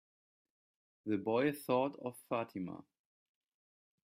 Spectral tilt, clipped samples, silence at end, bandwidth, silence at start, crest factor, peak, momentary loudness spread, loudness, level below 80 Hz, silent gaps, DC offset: -6.5 dB/octave; under 0.1%; 1.2 s; 15.5 kHz; 1.05 s; 20 dB; -20 dBFS; 13 LU; -37 LUFS; -82 dBFS; none; under 0.1%